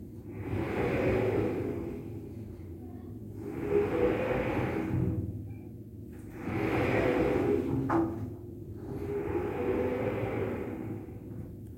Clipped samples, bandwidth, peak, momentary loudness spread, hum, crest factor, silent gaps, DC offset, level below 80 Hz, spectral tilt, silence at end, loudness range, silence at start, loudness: under 0.1%; 16.5 kHz; -16 dBFS; 16 LU; none; 16 dB; none; under 0.1%; -50 dBFS; -8.5 dB/octave; 0 s; 3 LU; 0 s; -32 LUFS